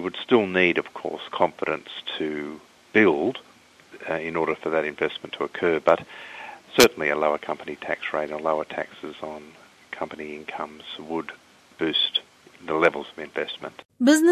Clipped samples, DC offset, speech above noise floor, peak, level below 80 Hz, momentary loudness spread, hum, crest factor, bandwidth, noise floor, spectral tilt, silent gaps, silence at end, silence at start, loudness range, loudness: under 0.1%; under 0.1%; 25 dB; -2 dBFS; -62 dBFS; 18 LU; none; 24 dB; 13 kHz; -50 dBFS; -3.5 dB/octave; 13.85-13.89 s; 0 s; 0 s; 8 LU; -24 LUFS